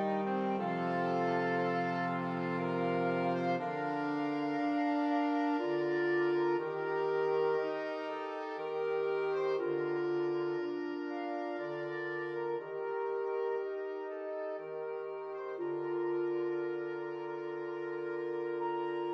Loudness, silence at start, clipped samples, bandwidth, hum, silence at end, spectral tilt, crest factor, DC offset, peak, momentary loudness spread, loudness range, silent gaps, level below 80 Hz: -35 LUFS; 0 s; under 0.1%; 6.6 kHz; none; 0 s; -8 dB/octave; 14 dB; under 0.1%; -20 dBFS; 8 LU; 5 LU; none; -86 dBFS